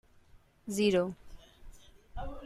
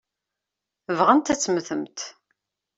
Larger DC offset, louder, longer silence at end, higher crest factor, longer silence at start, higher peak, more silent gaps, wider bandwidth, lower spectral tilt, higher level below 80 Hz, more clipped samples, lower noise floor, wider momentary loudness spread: neither; second, -32 LUFS vs -22 LUFS; second, 0 s vs 0.65 s; about the same, 20 dB vs 22 dB; second, 0.35 s vs 0.9 s; second, -16 dBFS vs -4 dBFS; neither; first, 14.5 kHz vs 8 kHz; first, -5 dB/octave vs -3.5 dB/octave; first, -50 dBFS vs -64 dBFS; neither; second, -60 dBFS vs -86 dBFS; first, 22 LU vs 16 LU